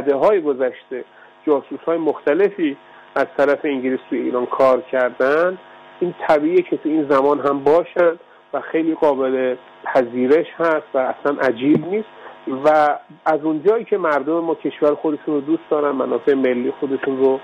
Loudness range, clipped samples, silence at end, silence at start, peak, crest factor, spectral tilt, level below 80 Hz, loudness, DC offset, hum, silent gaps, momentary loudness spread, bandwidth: 2 LU; under 0.1%; 0 s; 0 s; -6 dBFS; 12 dB; -7.5 dB/octave; -64 dBFS; -19 LUFS; under 0.1%; none; none; 9 LU; 7.6 kHz